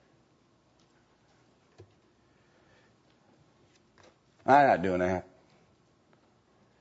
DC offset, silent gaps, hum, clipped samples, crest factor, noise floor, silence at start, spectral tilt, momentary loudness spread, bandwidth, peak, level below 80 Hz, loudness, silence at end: under 0.1%; none; none; under 0.1%; 24 dB; -67 dBFS; 4.45 s; -7 dB/octave; 15 LU; 8 kHz; -8 dBFS; -70 dBFS; -26 LUFS; 1.6 s